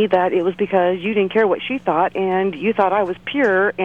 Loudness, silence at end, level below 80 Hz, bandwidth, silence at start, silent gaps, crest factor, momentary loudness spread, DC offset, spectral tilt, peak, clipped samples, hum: -18 LUFS; 0 s; -58 dBFS; 6.8 kHz; 0 s; none; 14 dB; 4 LU; 0.2%; -7.5 dB/octave; -4 dBFS; under 0.1%; none